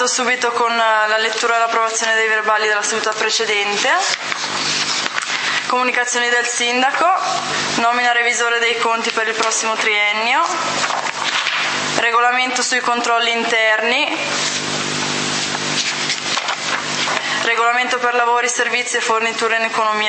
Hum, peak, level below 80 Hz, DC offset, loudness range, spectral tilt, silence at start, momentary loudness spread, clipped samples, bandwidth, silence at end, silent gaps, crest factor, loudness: none; 0 dBFS; -68 dBFS; under 0.1%; 2 LU; -0.5 dB/octave; 0 s; 4 LU; under 0.1%; 8.8 kHz; 0 s; none; 18 dB; -16 LUFS